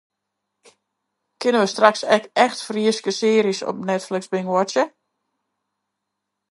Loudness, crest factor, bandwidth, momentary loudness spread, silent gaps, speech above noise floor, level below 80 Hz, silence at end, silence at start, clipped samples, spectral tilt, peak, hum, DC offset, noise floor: -20 LUFS; 22 dB; 11.5 kHz; 8 LU; none; 61 dB; -76 dBFS; 1.65 s; 1.4 s; under 0.1%; -4 dB/octave; 0 dBFS; none; under 0.1%; -80 dBFS